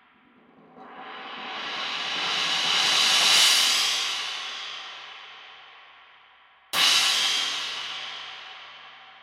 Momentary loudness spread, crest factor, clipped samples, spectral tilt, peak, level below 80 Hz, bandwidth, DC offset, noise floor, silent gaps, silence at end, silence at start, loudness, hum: 24 LU; 20 dB; under 0.1%; 2 dB/octave; -6 dBFS; -78 dBFS; 16.5 kHz; under 0.1%; -58 dBFS; none; 0.05 s; 0.75 s; -21 LUFS; none